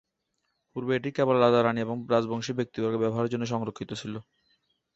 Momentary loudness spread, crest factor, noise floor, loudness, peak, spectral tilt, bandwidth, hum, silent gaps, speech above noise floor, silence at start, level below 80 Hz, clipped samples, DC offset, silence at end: 14 LU; 20 dB; -79 dBFS; -27 LUFS; -8 dBFS; -6.5 dB/octave; 8 kHz; none; none; 52 dB; 0.75 s; -66 dBFS; under 0.1%; under 0.1%; 0.75 s